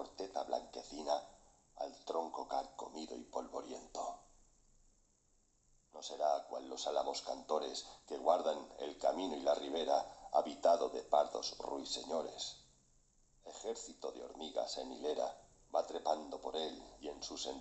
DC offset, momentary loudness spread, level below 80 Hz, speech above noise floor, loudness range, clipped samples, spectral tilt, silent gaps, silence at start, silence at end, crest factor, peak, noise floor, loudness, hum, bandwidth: under 0.1%; 13 LU; -70 dBFS; 35 dB; 9 LU; under 0.1%; -2.5 dB/octave; none; 0 s; 0 s; 24 dB; -18 dBFS; -74 dBFS; -40 LUFS; none; 8.4 kHz